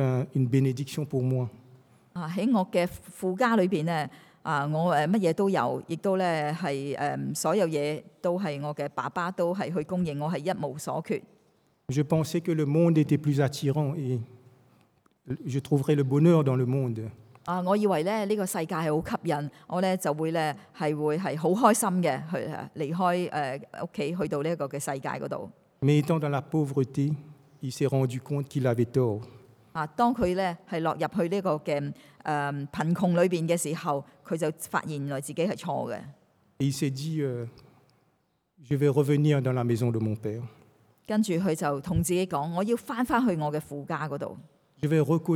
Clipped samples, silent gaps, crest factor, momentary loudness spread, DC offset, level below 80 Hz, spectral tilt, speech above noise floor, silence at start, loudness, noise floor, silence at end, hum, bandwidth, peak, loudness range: under 0.1%; none; 20 dB; 10 LU; under 0.1%; -62 dBFS; -6.5 dB/octave; 45 dB; 0 s; -28 LUFS; -72 dBFS; 0 s; none; 16.5 kHz; -8 dBFS; 4 LU